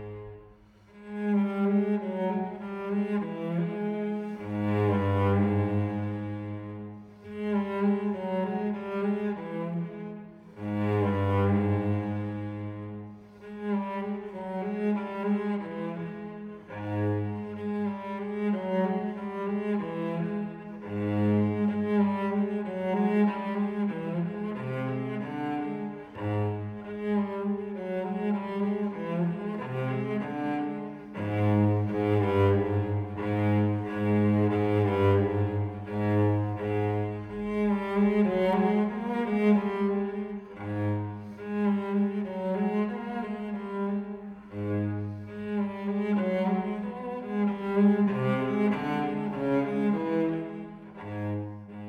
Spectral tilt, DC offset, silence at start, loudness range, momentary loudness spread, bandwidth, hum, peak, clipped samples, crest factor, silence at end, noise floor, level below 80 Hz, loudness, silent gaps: -9.5 dB/octave; under 0.1%; 0 s; 6 LU; 12 LU; 5 kHz; none; -12 dBFS; under 0.1%; 16 dB; 0 s; -55 dBFS; -62 dBFS; -29 LUFS; none